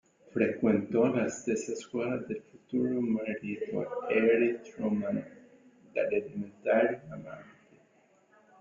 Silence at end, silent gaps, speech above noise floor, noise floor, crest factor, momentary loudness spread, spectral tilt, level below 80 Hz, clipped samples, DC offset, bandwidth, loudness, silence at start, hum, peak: 1.1 s; none; 35 dB; -66 dBFS; 18 dB; 14 LU; -6.5 dB/octave; -70 dBFS; under 0.1%; under 0.1%; 7.6 kHz; -31 LUFS; 0.35 s; none; -14 dBFS